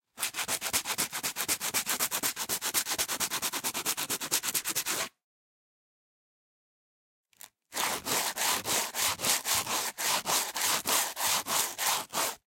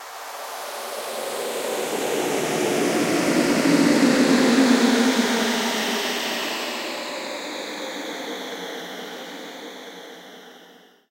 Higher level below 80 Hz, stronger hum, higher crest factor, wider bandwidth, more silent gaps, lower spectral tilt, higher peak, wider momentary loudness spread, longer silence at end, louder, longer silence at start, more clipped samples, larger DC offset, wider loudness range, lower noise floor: about the same, -68 dBFS vs -70 dBFS; neither; first, 24 dB vs 18 dB; about the same, 17 kHz vs 16 kHz; first, 5.24-7.24 s vs none; second, 0.5 dB/octave vs -3.5 dB/octave; about the same, -8 dBFS vs -6 dBFS; second, 5 LU vs 18 LU; second, 0.1 s vs 0.4 s; second, -29 LUFS vs -22 LUFS; first, 0.15 s vs 0 s; neither; neither; second, 8 LU vs 14 LU; first, -55 dBFS vs -50 dBFS